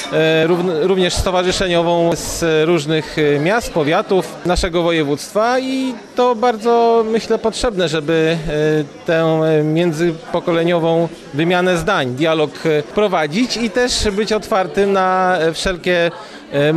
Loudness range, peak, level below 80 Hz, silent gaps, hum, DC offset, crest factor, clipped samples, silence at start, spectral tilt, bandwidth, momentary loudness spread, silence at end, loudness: 1 LU; -6 dBFS; -36 dBFS; none; none; under 0.1%; 10 dB; under 0.1%; 0 s; -5 dB/octave; 13 kHz; 4 LU; 0 s; -16 LUFS